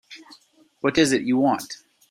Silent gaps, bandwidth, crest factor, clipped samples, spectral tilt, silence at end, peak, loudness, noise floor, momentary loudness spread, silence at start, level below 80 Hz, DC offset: none; 15.5 kHz; 20 dB; under 0.1%; -4.5 dB/octave; 0.35 s; -4 dBFS; -21 LUFS; -56 dBFS; 22 LU; 0.1 s; -58 dBFS; under 0.1%